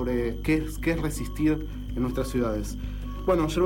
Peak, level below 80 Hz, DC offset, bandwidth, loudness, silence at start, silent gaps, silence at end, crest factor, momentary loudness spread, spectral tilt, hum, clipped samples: -12 dBFS; -34 dBFS; under 0.1%; 17 kHz; -28 LUFS; 0 s; none; 0 s; 14 dB; 8 LU; -6.5 dB/octave; 50 Hz at -35 dBFS; under 0.1%